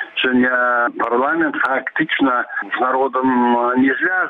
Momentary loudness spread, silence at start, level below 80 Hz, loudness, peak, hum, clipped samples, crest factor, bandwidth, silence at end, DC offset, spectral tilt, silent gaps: 4 LU; 0 s; -60 dBFS; -17 LUFS; -8 dBFS; none; under 0.1%; 10 dB; 4.3 kHz; 0 s; under 0.1%; -6.5 dB/octave; none